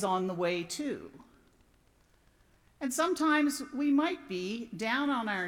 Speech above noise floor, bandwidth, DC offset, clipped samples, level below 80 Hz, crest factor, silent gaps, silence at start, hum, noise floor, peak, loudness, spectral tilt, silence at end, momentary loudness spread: 35 dB; 17 kHz; under 0.1%; under 0.1%; -68 dBFS; 16 dB; none; 0 s; none; -66 dBFS; -16 dBFS; -31 LUFS; -4 dB/octave; 0 s; 11 LU